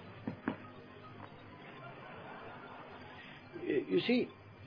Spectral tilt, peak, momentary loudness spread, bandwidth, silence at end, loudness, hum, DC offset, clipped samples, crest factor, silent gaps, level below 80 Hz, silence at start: -4.5 dB/octave; -20 dBFS; 19 LU; 5.2 kHz; 0 s; -39 LUFS; none; under 0.1%; under 0.1%; 22 dB; none; -74 dBFS; 0 s